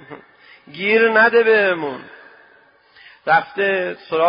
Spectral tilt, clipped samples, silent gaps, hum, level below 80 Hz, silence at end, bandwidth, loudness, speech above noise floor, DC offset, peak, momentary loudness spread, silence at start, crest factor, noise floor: -9 dB/octave; under 0.1%; none; none; -66 dBFS; 0 s; 5.2 kHz; -16 LUFS; 36 dB; under 0.1%; -2 dBFS; 17 LU; 0.1 s; 16 dB; -52 dBFS